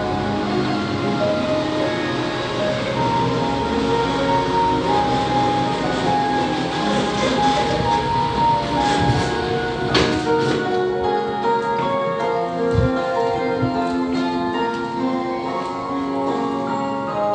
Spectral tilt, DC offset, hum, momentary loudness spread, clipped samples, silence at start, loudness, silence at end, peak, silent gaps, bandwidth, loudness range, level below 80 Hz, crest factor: -5.5 dB/octave; under 0.1%; none; 4 LU; under 0.1%; 0 s; -20 LUFS; 0 s; -4 dBFS; none; 10 kHz; 3 LU; -40 dBFS; 16 dB